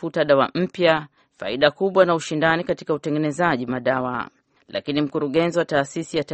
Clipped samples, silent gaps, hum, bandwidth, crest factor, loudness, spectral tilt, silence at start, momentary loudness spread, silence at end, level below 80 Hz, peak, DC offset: under 0.1%; none; none; 8.8 kHz; 20 dB; -21 LUFS; -5.5 dB/octave; 0 s; 10 LU; 0 s; -58 dBFS; -2 dBFS; under 0.1%